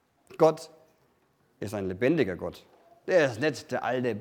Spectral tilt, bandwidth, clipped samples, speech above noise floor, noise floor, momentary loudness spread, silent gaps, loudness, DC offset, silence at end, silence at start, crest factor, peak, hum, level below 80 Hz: -6 dB/octave; 16.5 kHz; under 0.1%; 41 dB; -68 dBFS; 16 LU; none; -27 LUFS; under 0.1%; 0 s; 0.3 s; 20 dB; -8 dBFS; none; -68 dBFS